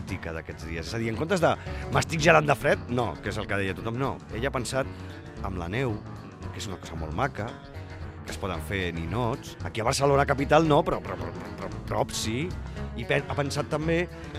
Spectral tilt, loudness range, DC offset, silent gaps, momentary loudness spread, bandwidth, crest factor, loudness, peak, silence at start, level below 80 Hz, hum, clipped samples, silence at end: -5.5 dB/octave; 8 LU; under 0.1%; none; 15 LU; 15.5 kHz; 24 dB; -28 LUFS; -4 dBFS; 0 s; -44 dBFS; none; under 0.1%; 0 s